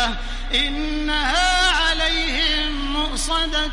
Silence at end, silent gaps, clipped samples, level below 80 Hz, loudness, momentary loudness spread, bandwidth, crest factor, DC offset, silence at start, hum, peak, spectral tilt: 0 s; none; under 0.1%; -26 dBFS; -19 LUFS; 7 LU; 11.5 kHz; 16 dB; under 0.1%; 0 s; none; -6 dBFS; -2 dB/octave